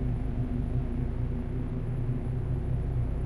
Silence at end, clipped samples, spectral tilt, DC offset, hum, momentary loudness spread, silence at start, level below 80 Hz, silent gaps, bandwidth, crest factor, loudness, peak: 0 s; under 0.1%; -10 dB/octave; under 0.1%; none; 2 LU; 0 s; -34 dBFS; none; 11 kHz; 12 dB; -32 LUFS; -16 dBFS